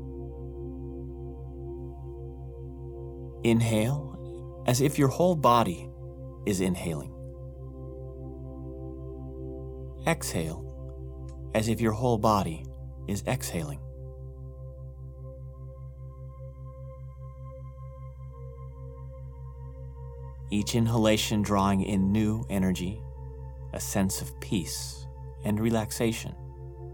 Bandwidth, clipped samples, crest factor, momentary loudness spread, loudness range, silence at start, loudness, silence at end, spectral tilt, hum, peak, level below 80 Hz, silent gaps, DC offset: 19 kHz; under 0.1%; 22 dB; 19 LU; 16 LU; 0 s; -29 LUFS; 0 s; -5.5 dB/octave; none; -8 dBFS; -44 dBFS; none; under 0.1%